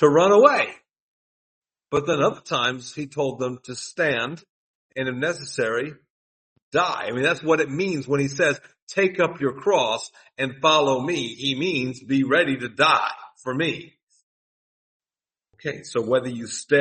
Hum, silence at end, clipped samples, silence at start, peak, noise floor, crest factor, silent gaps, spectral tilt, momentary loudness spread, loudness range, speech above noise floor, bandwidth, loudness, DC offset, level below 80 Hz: none; 0 s; under 0.1%; 0 s; -2 dBFS; under -90 dBFS; 22 dB; 1.00-1.62 s, 4.49-4.89 s, 6.10-6.56 s, 6.62-6.71 s, 8.82-8.87 s, 14.03-14.07 s, 14.23-15.00 s; -4.5 dB/octave; 13 LU; 6 LU; over 68 dB; 8.8 kHz; -22 LUFS; under 0.1%; -66 dBFS